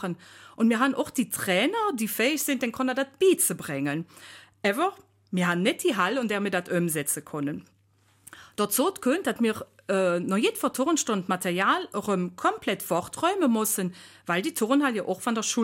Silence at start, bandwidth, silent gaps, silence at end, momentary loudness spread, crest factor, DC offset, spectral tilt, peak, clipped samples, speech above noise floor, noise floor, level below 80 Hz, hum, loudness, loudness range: 0 s; 16.5 kHz; none; 0 s; 7 LU; 18 dB; under 0.1%; -4 dB/octave; -10 dBFS; under 0.1%; 38 dB; -64 dBFS; -70 dBFS; none; -26 LUFS; 3 LU